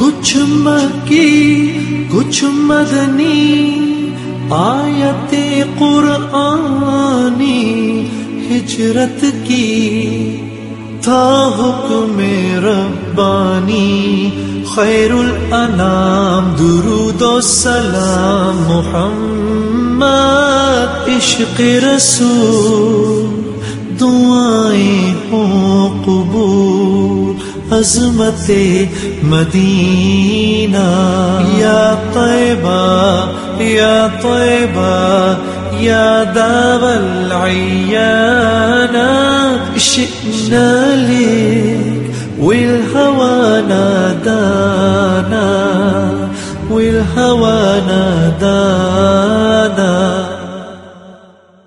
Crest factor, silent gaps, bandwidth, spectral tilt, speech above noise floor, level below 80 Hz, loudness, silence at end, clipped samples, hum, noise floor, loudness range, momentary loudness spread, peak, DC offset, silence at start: 10 dB; none; 11.5 kHz; -5 dB/octave; 31 dB; -36 dBFS; -11 LUFS; 0.5 s; under 0.1%; none; -42 dBFS; 3 LU; 6 LU; 0 dBFS; under 0.1%; 0 s